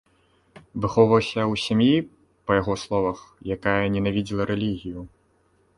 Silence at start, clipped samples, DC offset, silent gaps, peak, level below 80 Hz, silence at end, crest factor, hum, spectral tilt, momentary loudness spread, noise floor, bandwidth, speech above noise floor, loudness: 0.75 s; under 0.1%; under 0.1%; none; -2 dBFS; -48 dBFS; 0.7 s; 22 dB; none; -6.5 dB/octave; 17 LU; -63 dBFS; 11.5 kHz; 41 dB; -23 LUFS